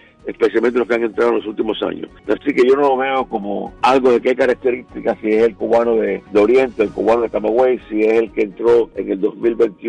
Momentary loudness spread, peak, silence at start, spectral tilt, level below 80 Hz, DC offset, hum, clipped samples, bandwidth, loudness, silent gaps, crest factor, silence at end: 8 LU; -4 dBFS; 0.25 s; -6 dB/octave; -50 dBFS; under 0.1%; none; under 0.1%; 9.6 kHz; -16 LUFS; none; 12 dB; 0 s